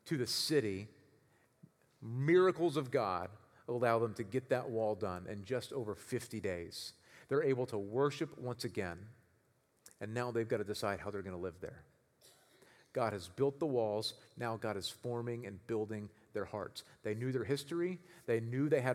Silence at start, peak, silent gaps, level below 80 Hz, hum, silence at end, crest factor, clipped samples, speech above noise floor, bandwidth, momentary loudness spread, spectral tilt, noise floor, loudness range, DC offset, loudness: 0.05 s; -16 dBFS; none; -78 dBFS; none; 0 s; 22 dB; under 0.1%; 37 dB; 16 kHz; 12 LU; -5.5 dB/octave; -74 dBFS; 7 LU; under 0.1%; -38 LUFS